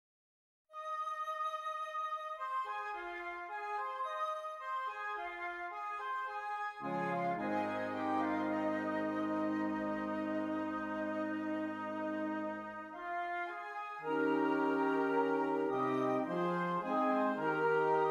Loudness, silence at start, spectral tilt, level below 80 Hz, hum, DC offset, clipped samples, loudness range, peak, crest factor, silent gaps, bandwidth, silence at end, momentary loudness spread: -37 LUFS; 0.7 s; -7 dB/octave; -78 dBFS; none; under 0.1%; under 0.1%; 6 LU; -22 dBFS; 16 dB; none; 12 kHz; 0 s; 9 LU